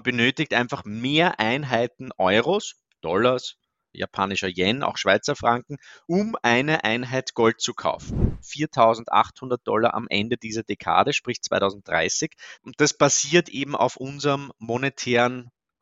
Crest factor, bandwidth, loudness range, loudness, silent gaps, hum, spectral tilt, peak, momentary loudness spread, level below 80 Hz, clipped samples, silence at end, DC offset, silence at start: 22 dB; 8 kHz; 2 LU; -23 LUFS; none; none; -3.5 dB/octave; -2 dBFS; 10 LU; -44 dBFS; under 0.1%; 0.3 s; under 0.1%; 0.05 s